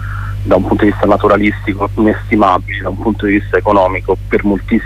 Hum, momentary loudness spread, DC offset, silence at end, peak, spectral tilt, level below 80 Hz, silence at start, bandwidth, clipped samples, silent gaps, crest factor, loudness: 50 Hz at -25 dBFS; 7 LU; under 0.1%; 0 s; 0 dBFS; -8 dB/octave; -26 dBFS; 0 s; 13 kHz; under 0.1%; none; 12 dB; -13 LUFS